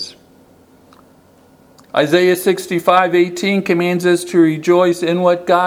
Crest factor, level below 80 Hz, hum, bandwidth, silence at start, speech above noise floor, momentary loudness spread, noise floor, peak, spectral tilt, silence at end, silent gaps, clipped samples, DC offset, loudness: 16 dB; -62 dBFS; none; 16 kHz; 0 s; 35 dB; 4 LU; -48 dBFS; 0 dBFS; -5.5 dB/octave; 0 s; none; under 0.1%; under 0.1%; -14 LUFS